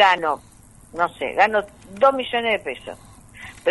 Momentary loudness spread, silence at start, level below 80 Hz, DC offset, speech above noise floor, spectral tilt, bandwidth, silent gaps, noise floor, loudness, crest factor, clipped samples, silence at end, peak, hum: 20 LU; 0 s; -54 dBFS; under 0.1%; 21 dB; -3.5 dB/octave; 11.5 kHz; none; -42 dBFS; -21 LUFS; 20 dB; under 0.1%; 0 s; -2 dBFS; none